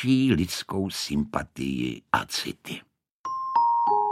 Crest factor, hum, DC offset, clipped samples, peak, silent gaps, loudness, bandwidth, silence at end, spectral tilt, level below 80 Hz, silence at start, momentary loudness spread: 22 dB; none; under 0.1%; under 0.1%; -4 dBFS; 3.11-3.24 s; -26 LUFS; 16 kHz; 0 s; -5 dB/octave; -50 dBFS; 0 s; 14 LU